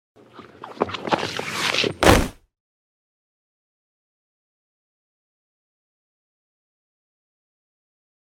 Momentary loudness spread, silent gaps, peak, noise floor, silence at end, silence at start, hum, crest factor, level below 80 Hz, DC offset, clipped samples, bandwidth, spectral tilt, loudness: 17 LU; none; 0 dBFS; -43 dBFS; 6 s; 0.35 s; none; 28 dB; -40 dBFS; under 0.1%; under 0.1%; 16 kHz; -4 dB/octave; -21 LUFS